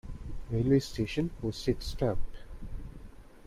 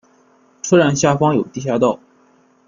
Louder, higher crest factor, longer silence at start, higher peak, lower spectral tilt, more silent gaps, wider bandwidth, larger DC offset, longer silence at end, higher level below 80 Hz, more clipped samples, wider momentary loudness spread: second, -32 LUFS vs -16 LUFS; about the same, 16 dB vs 16 dB; second, 0.05 s vs 0.65 s; second, -14 dBFS vs -2 dBFS; first, -7 dB/octave vs -5.5 dB/octave; neither; first, 14.5 kHz vs 7.4 kHz; neither; second, 0 s vs 0.7 s; first, -42 dBFS vs -56 dBFS; neither; first, 20 LU vs 11 LU